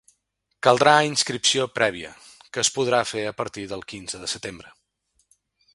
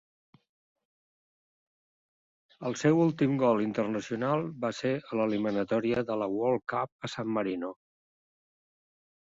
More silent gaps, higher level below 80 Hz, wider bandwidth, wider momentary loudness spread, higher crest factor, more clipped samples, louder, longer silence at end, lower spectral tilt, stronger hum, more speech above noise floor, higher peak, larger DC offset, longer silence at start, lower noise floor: second, none vs 6.92-6.99 s; first, -60 dBFS vs -70 dBFS; first, 11.5 kHz vs 7.8 kHz; first, 17 LU vs 10 LU; first, 24 dB vs 18 dB; neither; first, -22 LUFS vs -30 LUFS; second, 1.15 s vs 1.6 s; second, -2.5 dB/octave vs -6.5 dB/octave; neither; second, 52 dB vs over 61 dB; first, 0 dBFS vs -12 dBFS; neither; second, 0.65 s vs 2.6 s; second, -74 dBFS vs under -90 dBFS